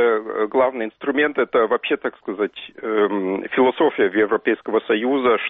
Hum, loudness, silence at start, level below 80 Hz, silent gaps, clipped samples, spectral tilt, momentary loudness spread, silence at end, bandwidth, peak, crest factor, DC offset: none; -20 LUFS; 0 s; -64 dBFS; none; under 0.1%; -2.5 dB/octave; 7 LU; 0 s; 4 kHz; -6 dBFS; 14 dB; under 0.1%